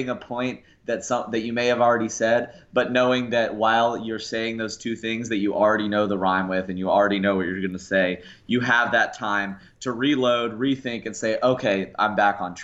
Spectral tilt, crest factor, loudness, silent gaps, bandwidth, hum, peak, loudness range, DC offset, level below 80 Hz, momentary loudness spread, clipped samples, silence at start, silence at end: -4.5 dB/octave; 16 dB; -23 LUFS; none; 8.2 kHz; none; -8 dBFS; 1 LU; under 0.1%; -60 dBFS; 9 LU; under 0.1%; 0 s; 0 s